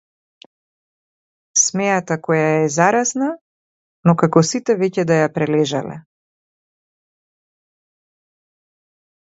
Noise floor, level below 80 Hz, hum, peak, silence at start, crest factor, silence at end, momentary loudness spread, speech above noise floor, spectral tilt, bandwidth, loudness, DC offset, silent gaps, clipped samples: under -90 dBFS; -64 dBFS; none; 0 dBFS; 1.55 s; 20 dB; 3.4 s; 9 LU; over 73 dB; -4.5 dB/octave; 8.2 kHz; -17 LUFS; under 0.1%; 3.41-4.03 s; under 0.1%